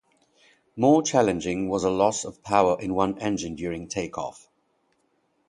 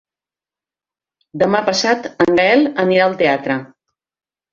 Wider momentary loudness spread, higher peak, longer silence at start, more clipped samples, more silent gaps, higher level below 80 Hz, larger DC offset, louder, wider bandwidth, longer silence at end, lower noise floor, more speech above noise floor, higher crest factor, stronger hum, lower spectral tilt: first, 12 LU vs 8 LU; about the same, -4 dBFS vs -2 dBFS; second, 0.75 s vs 1.35 s; neither; neither; about the same, -54 dBFS vs -56 dBFS; neither; second, -24 LUFS vs -15 LUFS; first, 11.5 kHz vs 7.6 kHz; first, 1.15 s vs 0.85 s; second, -70 dBFS vs -90 dBFS; second, 46 dB vs 75 dB; first, 22 dB vs 16 dB; neither; about the same, -5 dB/octave vs -4.5 dB/octave